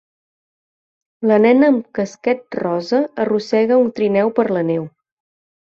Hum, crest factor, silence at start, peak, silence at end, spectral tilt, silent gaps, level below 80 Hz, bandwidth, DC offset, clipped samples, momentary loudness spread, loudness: none; 16 dB; 1.2 s; -2 dBFS; 0.8 s; -7 dB/octave; none; -64 dBFS; 7.4 kHz; under 0.1%; under 0.1%; 9 LU; -17 LUFS